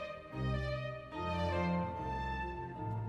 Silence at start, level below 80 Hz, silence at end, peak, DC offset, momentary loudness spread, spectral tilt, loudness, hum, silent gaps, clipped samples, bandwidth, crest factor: 0 s; -48 dBFS; 0 s; -24 dBFS; under 0.1%; 7 LU; -7.5 dB/octave; -38 LUFS; none; none; under 0.1%; 9.8 kHz; 14 dB